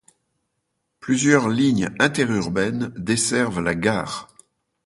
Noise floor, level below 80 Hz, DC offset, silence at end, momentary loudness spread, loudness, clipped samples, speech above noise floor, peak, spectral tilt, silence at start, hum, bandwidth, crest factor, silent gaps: -75 dBFS; -52 dBFS; under 0.1%; 0.6 s; 9 LU; -21 LUFS; under 0.1%; 55 dB; -2 dBFS; -4.5 dB/octave; 1.05 s; none; 11.5 kHz; 20 dB; none